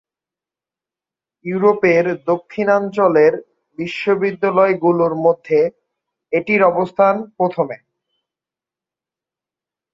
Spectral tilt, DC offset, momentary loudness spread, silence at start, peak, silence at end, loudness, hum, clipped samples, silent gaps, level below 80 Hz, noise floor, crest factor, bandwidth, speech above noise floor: -7.5 dB/octave; under 0.1%; 10 LU; 1.45 s; -2 dBFS; 2.15 s; -16 LUFS; none; under 0.1%; none; -64 dBFS; -89 dBFS; 16 dB; 7.4 kHz; 73 dB